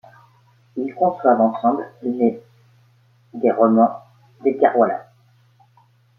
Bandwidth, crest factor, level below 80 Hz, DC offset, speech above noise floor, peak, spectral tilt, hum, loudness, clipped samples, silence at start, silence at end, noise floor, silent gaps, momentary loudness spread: 4 kHz; 18 dB; -70 dBFS; under 0.1%; 39 dB; -2 dBFS; -10 dB/octave; none; -19 LUFS; under 0.1%; 0.75 s; 1.15 s; -56 dBFS; none; 16 LU